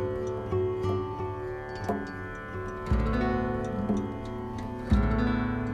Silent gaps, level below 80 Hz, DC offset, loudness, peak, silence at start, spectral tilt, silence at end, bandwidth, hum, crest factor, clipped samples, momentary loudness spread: none; -36 dBFS; under 0.1%; -31 LUFS; -12 dBFS; 0 s; -8 dB/octave; 0 s; 9.6 kHz; none; 18 dB; under 0.1%; 9 LU